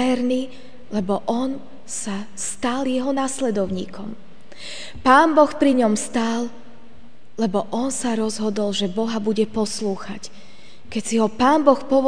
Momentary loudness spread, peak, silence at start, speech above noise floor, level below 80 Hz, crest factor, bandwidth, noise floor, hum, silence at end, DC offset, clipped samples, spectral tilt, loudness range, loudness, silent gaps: 17 LU; 0 dBFS; 0 s; 29 dB; -54 dBFS; 20 dB; 10 kHz; -50 dBFS; none; 0 s; 2%; under 0.1%; -4.5 dB/octave; 5 LU; -21 LUFS; none